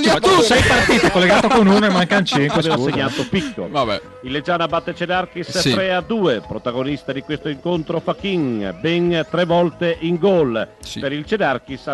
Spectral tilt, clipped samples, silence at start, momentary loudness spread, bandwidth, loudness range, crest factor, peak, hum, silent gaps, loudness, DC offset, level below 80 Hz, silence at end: -5 dB/octave; under 0.1%; 0 s; 12 LU; 13 kHz; 6 LU; 14 dB; -4 dBFS; none; none; -17 LUFS; under 0.1%; -42 dBFS; 0 s